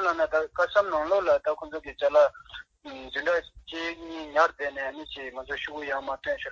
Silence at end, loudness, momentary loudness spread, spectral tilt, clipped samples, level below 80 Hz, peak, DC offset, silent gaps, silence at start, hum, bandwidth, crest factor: 0 s; -27 LUFS; 14 LU; -3.5 dB/octave; under 0.1%; -58 dBFS; -8 dBFS; under 0.1%; none; 0 s; none; 7.4 kHz; 20 dB